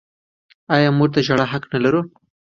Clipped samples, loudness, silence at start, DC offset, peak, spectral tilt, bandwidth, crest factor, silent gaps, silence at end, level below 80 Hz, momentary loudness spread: under 0.1%; -18 LUFS; 0.7 s; under 0.1%; 0 dBFS; -7 dB/octave; 7.4 kHz; 20 dB; none; 0.5 s; -54 dBFS; 6 LU